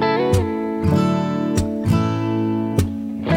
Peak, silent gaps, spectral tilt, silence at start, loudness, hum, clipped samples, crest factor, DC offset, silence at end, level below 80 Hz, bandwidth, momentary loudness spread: -4 dBFS; none; -7 dB/octave; 0 s; -20 LUFS; none; under 0.1%; 16 dB; under 0.1%; 0 s; -40 dBFS; 16.5 kHz; 4 LU